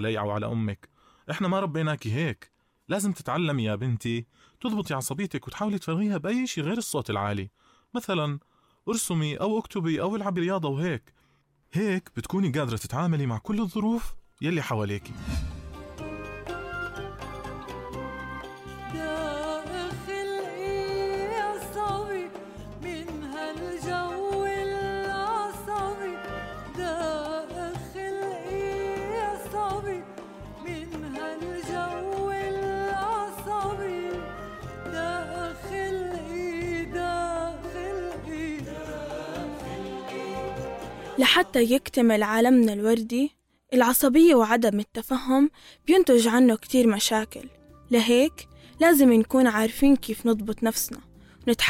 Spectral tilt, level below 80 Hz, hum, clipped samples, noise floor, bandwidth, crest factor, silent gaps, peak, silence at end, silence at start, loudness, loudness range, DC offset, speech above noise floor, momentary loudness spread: -5 dB/octave; -50 dBFS; none; under 0.1%; -66 dBFS; 16.5 kHz; 18 dB; none; -8 dBFS; 0 s; 0 s; -26 LUFS; 12 LU; under 0.1%; 43 dB; 17 LU